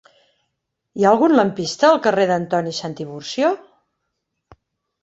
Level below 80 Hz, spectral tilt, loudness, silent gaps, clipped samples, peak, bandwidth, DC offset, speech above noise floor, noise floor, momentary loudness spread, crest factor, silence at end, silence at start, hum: -62 dBFS; -5 dB/octave; -18 LUFS; none; under 0.1%; -2 dBFS; 8.2 kHz; under 0.1%; 59 dB; -76 dBFS; 15 LU; 18 dB; 1.45 s; 0.95 s; none